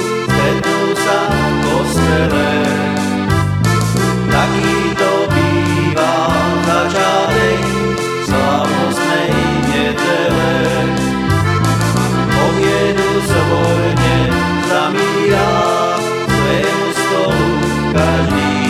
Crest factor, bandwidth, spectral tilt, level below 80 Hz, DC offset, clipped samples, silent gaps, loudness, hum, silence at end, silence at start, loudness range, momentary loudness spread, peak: 14 dB; 16.5 kHz; -5.5 dB/octave; -32 dBFS; 0.1%; under 0.1%; none; -14 LUFS; none; 0 s; 0 s; 1 LU; 2 LU; 0 dBFS